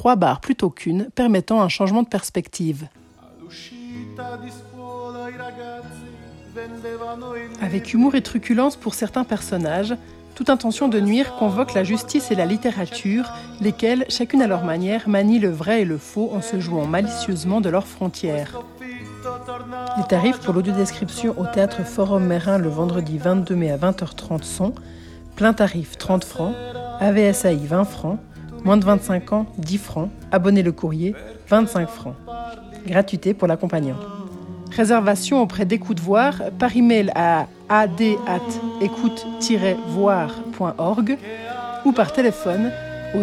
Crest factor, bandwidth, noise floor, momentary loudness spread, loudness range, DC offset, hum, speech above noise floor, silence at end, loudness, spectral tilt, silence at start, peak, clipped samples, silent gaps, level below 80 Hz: 18 dB; 14 kHz; -45 dBFS; 16 LU; 6 LU; under 0.1%; none; 25 dB; 0 s; -20 LUFS; -6 dB/octave; 0 s; -2 dBFS; under 0.1%; none; -50 dBFS